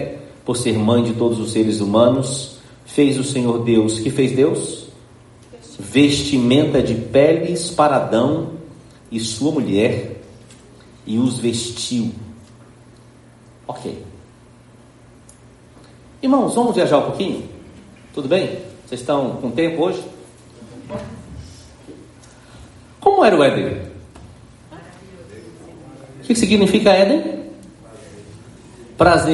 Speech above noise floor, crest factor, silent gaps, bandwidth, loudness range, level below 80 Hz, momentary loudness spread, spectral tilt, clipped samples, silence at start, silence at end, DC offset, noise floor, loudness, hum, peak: 30 dB; 18 dB; none; 11.5 kHz; 9 LU; -48 dBFS; 23 LU; -5.5 dB/octave; under 0.1%; 0 s; 0 s; under 0.1%; -46 dBFS; -17 LUFS; none; 0 dBFS